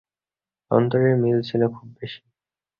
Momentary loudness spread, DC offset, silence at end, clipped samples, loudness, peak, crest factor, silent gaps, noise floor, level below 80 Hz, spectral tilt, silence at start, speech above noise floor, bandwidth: 18 LU; under 0.1%; 0.65 s; under 0.1%; -21 LUFS; -4 dBFS; 18 dB; none; under -90 dBFS; -60 dBFS; -10 dB/octave; 0.7 s; over 69 dB; 5.6 kHz